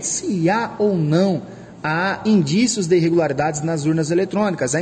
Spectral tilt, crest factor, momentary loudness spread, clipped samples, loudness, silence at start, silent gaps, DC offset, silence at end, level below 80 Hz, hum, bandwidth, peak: -5 dB/octave; 14 dB; 5 LU; under 0.1%; -19 LUFS; 0 s; none; under 0.1%; 0 s; -56 dBFS; none; 10.5 kHz; -4 dBFS